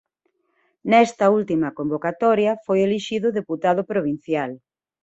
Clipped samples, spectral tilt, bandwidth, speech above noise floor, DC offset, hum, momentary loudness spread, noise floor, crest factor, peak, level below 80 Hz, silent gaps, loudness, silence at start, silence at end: under 0.1%; -6 dB/octave; 8.2 kHz; 51 dB; under 0.1%; none; 8 LU; -71 dBFS; 18 dB; -2 dBFS; -64 dBFS; none; -21 LUFS; 0.85 s; 0.45 s